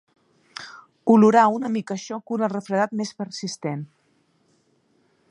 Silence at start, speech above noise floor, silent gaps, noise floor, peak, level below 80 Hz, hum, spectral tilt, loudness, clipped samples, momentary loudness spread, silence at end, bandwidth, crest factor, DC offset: 0.6 s; 44 dB; none; -65 dBFS; -4 dBFS; -74 dBFS; none; -6 dB/octave; -22 LUFS; under 0.1%; 23 LU; 1.45 s; 10 kHz; 20 dB; under 0.1%